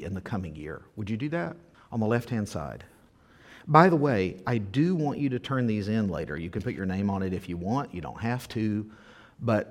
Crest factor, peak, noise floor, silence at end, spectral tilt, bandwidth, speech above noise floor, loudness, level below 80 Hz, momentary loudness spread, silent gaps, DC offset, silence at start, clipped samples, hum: 26 dB; -2 dBFS; -57 dBFS; 0 s; -7.5 dB/octave; 16 kHz; 30 dB; -28 LUFS; -54 dBFS; 14 LU; none; under 0.1%; 0 s; under 0.1%; none